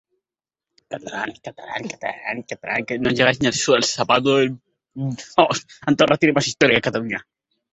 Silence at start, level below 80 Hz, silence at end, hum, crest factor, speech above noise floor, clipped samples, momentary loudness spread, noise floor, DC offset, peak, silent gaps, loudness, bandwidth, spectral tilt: 0.9 s; -56 dBFS; 0.55 s; none; 20 dB; over 70 dB; under 0.1%; 14 LU; under -90 dBFS; under 0.1%; 0 dBFS; none; -20 LUFS; 8.4 kHz; -4 dB/octave